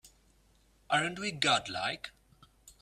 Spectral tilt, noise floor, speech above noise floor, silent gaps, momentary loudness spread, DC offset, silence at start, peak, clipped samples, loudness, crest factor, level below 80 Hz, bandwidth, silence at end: -2.5 dB/octave; -66 dBFS; 34 dB; none; 12 LU; under 0.1%; 0.05 s; -12 dBFS; under 0.1%; -31 LUFS; 22 dB; -66 dBFS; 15 kHz; 0.1 s